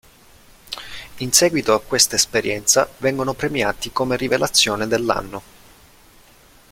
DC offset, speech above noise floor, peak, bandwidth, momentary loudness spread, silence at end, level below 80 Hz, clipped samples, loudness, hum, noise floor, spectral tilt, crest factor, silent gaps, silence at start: under 0.1%; 30 dB; 0 dBFS; 16.5 kHz; 17 LU; 1.3 s; -48 dBFS; under 0.1%; -18 LUFS; none; -50 dBFS; -2 dB/octave; 22 dB; none; 0.7 s